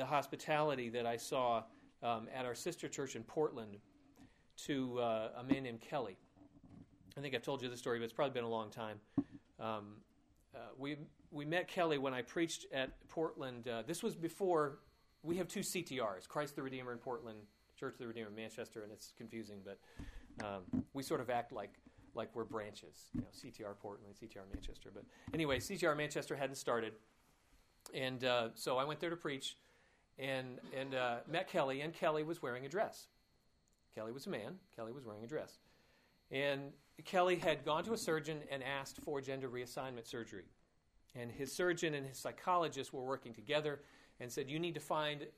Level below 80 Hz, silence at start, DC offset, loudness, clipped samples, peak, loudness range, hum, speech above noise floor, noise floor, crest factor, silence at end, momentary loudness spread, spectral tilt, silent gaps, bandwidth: -68 dBFS; 0 s; under 0.1%; -42 LUFS; under 0.1%; -20 dBFS; 7 LU; none; 34 dB; -76 dBFS; 22 dB; 0.05 s; 17 LU; -4.5 dB/octave; none; 15.5 kHz